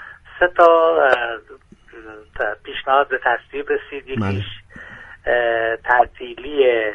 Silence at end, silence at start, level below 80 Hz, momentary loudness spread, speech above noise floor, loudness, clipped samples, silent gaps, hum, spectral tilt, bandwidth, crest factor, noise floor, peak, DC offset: 0 s; 0 s; -48 dBFS; 23 LU; 21 dB; -18 LUFS; under 0.1%; none; none; -6.5 dB/octave; 7.6 kHz; 18 dB; -39 dBFS; 0 dBFS; under 0.1%